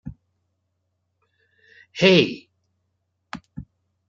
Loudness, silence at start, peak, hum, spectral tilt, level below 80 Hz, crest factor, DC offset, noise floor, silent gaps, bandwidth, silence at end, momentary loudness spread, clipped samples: -18 LUFS; 0.05 s; -4 dBFS; none; -5.5 dB/octave; -56 dBFS; 22 dB; under 0.1%; -74 dBFS; none; 7.6 kHz; 0.5 s; 26 LU; under 0.1%